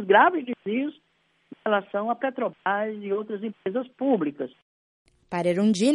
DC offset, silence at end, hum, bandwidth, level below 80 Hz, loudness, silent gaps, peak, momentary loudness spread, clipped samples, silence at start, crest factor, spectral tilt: under 0.1%; 0 s; none; 11.5 kHz; -74 dBFS; -26 LUFS; 4.62-5.05 s; -4 dBFS; 12 LU; under 0.1%; 0 s; 22 dB; -5.5 dB/octave